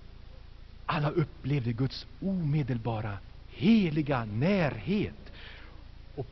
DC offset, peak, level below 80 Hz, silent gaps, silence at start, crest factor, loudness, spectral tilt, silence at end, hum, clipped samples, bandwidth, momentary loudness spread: under 0.1%; -14 dBFS; -48 dBFS; none; 0 s; 18 dB; -30 LUFS; -6.5 dB/octave; 0 s; none; under 0.1%; 6.2 kHz; 22 LU